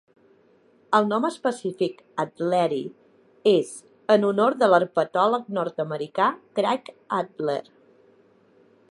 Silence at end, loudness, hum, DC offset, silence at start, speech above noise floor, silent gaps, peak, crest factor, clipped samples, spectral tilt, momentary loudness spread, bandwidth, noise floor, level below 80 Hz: 1.3 s; -24 LUFS; none; under 0.1%; 0.9 s; 36 dB; none; -4 dBFS; 22 dB; under 0.1%; -5.5 dB/octave; 10 LU; 11.5 kHz; -59 dBFS; -78 dBFS